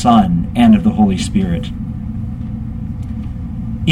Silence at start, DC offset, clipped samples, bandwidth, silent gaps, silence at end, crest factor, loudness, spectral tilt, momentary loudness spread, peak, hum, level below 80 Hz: 0 s; under 0.1%; under 0.1%; 10.5 kHz; none; 0 s; 14 dB; -16 LUFS; -7 dB/octave; 14 LU; 0 dBFS; none; -28 dBFS